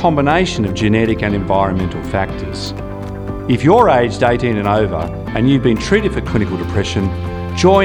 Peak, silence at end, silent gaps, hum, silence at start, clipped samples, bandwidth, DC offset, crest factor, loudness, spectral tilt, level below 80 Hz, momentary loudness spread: 0 dBFS; 0 s; none; none; 0 s; under 0.1%; 12.5 kHz; under 0.1%; 14 dB; -16 LUFS; -6.5 dB/octave; -30 dBFS; 11 LU